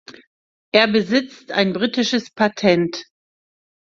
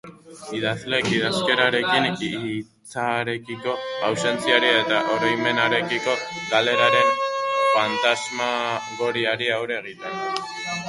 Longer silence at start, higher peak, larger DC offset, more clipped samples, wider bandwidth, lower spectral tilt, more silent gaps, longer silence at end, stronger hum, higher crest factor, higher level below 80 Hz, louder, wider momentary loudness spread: about the same, 0.1 s vs 0.05 s; about the same, 0 dBFS vs -2 dBFS; neither; neither; second, 7.6 kHz vs 11.5 kHz; first, -5 dB/octave vs -3.5 dB/octave; first, 0.27-0.72 s vs none; first, 0.9 s vs 0 s; neither; about the same, 20 dB vs 20 dB; about the same, -62 dBFS vs -64 dBFS; first, -18 LUFS vs -22 LUFS; second, 7 LU vs 11 LU